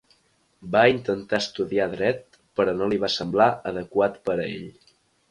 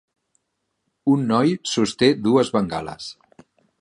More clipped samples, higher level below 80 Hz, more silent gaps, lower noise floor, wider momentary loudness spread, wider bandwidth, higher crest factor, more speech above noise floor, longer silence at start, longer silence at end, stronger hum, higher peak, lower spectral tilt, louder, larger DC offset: neither; about the same, -58 dBFS vs -58 dBFS; neither; second, -65 dBFS vs -76 dBFS; about the same, 13 LU vs 14 LU; about the same, 11 kHz vs 11 kHz; about the same, 20 dB vs 18 dB; second, 42 dB vs 56 dB; second, 0.6 s vs 1.05 s; about the same, 0.6 s vs 0.7 s; neither; about the same, -4 dBFS vs -4 dBFS; about the same, -5.5 dB/octave vs -5.5 dB/octave; second, -24 LUFS vs -20 LUFS; neither